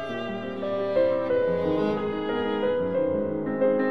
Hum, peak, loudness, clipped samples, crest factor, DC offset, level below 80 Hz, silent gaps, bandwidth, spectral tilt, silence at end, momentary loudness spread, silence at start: none; -12 dBFS; -26 LUFS; under 0.1%; 14 dB; 0.4%; -60 dBFS; none; 6 kHz; -8 dB/octave; 0 s; 7 LU; 0 s